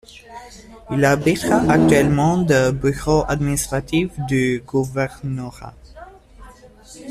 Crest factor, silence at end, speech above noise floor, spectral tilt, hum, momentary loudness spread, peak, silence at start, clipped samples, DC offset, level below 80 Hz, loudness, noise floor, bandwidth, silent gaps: 18 dB; 0 s; 25 dB; -6 dB/octave; none; 24 LU; -2 dBFS; 0.15 s; under 0.1%; under 0.1%; -38 dBFS; -18 LUFS; -43 dBFS; 14.5 kHz; none